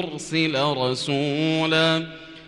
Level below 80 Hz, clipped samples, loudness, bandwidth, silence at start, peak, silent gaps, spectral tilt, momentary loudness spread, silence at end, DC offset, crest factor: -60 dBFS; under 0.1%; -22 LUFS; 11.5 kHz; 0 s; -8 dBFS; none; -5 dB/octave; 7 LU; 0 s; under 0.1%; 16 dB